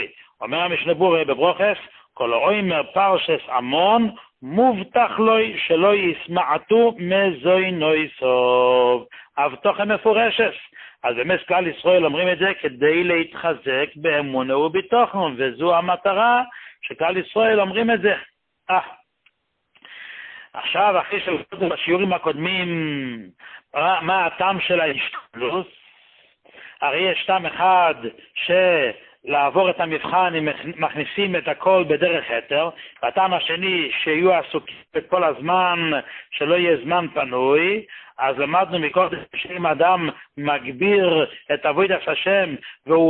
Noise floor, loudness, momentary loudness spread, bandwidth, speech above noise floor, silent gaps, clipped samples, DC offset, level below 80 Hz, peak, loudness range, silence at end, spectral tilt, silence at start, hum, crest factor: -64 dBFS; -20 LUFS; 10 LU; 4.4 kHz; 44 dB; none; under 0.1%; under 0.1%; -62 dBFS; -4 dBFS; 4 LU; 0 s; -10 dB/octave; 0 s; none; 16 dB